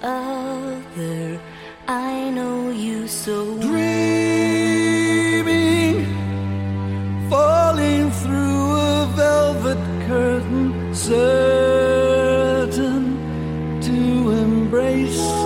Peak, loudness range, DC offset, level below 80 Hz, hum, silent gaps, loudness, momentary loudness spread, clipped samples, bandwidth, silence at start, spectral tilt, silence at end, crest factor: -6 dBFS; 5 LU; under 0.1%; -40 dBFS; none; none; -19 LUFS; 9 LU; under 0.1%; 16.5 kHz; 0 s; -5.5 dB/octave; 0 s; 12 dB